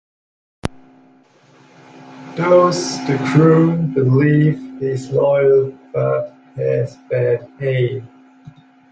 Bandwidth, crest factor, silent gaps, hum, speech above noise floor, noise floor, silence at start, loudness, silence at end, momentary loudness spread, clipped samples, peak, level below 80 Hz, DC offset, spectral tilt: 9.2 kHz; 16 dB; none; none; 35 dB; -51 dBFS; 0.65 s; -16 LUFS; 0.4 s; 17 LU; under 0.1%; 0 dBFS; -52 dBFS; under 0.1%; -7 dB/octave